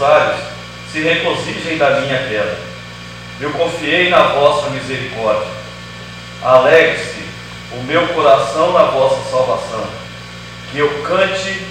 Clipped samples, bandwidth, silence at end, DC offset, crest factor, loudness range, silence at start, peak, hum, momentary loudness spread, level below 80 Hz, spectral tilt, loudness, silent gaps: 0.1%; 14 kHz; 0 s; under 0.1%; 16 dB; 4 LU; 0 s; 0 dBFS; 60 Hz at -50 dBFS; 19 LU; -44 dBFS; -4.5 dB/octave; -14 LUFS; none